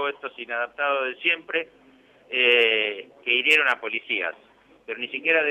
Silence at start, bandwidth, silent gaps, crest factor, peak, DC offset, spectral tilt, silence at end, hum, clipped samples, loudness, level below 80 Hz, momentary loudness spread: 0 s; 15.5 kHz; none; 18 dB; -6 dBFS; under 0.1%; -2 dB/octave; 0 s; none; under 0.1%; -22 LUFS; -76 dBFS; 14 LU